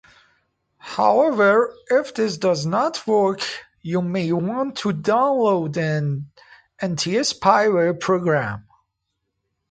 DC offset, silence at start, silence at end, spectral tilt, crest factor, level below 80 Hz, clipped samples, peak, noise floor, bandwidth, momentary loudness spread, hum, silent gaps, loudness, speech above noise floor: under 0.1%; 0.85 s; 1.1 s; -5.5 dB/octave; 20 dB; -62 dBFS; under 0.1%; 0 dBFS; -77 dBFS; 9.4 kHz; 11 LU; none; none; -20 LUFS; 57 dB